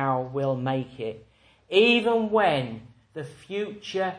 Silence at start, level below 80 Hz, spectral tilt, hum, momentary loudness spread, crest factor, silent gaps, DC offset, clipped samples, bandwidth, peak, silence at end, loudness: 0 s; -64 dBFS; -6 dB/octave; none; 20 LU; 20 dB; none; under 0.1%; under 0.1%; 10.5 kHz; -6 dBFS; 0 s; -24 LUFS